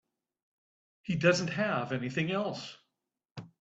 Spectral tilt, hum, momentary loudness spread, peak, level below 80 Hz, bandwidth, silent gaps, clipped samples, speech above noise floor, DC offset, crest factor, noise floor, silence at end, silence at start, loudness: -5.5 dB/octave; none; 22 LU; -12 dBFS; -72 dBFS; 8 kHz; 3.25-3.35 s; under 0.1%; 53 dB; under 0.1%; 22 dB; -84 dBFS; 0.15 s; 1.05 s; -31 LUFS